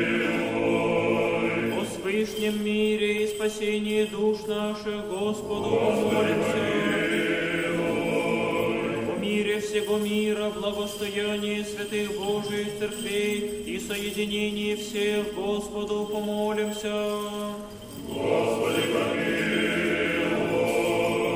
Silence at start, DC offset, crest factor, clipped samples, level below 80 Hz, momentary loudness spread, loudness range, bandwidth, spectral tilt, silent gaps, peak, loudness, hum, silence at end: 0 s; under 0.1%; 16 dB; under 0.1%; -54 dBFS; 6 LU; 4 LU; 16 kHz; -4.5 dB/octave; none; -12 dBFS; -26 LUFS; none; 0 s